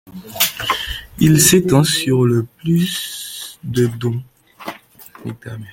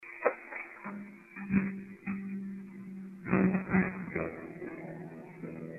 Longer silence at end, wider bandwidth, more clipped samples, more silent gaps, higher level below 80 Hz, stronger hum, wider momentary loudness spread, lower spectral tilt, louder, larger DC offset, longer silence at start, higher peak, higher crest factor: about the same, 0 s vs 0 s; first, 17 kHz vs 2.9 kHz; neither; neither; first, -44 dBFS vs -62 dBFS; neither; first, 22 LU vs 16 LU; second, -4.5 dB/octave vs -10.5 dB/octave; first, -16 LUFS vs -35 LUFS; neither; about the same, 0.05 s vs 0 s; first, 0 dBFS vs -12 dBFS; second, 18 dB vs 24 dB